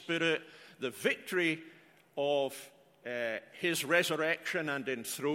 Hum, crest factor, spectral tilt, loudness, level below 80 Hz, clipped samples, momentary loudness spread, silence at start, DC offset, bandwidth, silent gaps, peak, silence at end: none; 20 dB; -3.5 dB/octave; -33 LUFS; -82 dBFS; under 0.1%; 12 LU; 0 s; under 0.1%; 16.5 kHz; none; -14 dBFS; 0 s